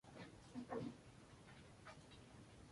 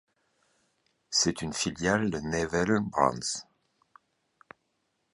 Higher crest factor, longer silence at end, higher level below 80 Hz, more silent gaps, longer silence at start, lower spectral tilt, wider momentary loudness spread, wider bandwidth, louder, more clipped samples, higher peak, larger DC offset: about the same, 22 dB vs 24 dB; second, 0 s vs 1.7 s; second, -74 dBFS vs -56 dBFS; neither; second, 0.05 s vs 1.1 s; first, -6 dB/octave vs -3.5 dB/octave; first, 12 LU vs 6 LU; about the same, 11.5 kHz vs 11.5 kHz; second, -56 LUFS vs -28 LUFS; neither; second, -34 dBFS vs -8 dBFS; neither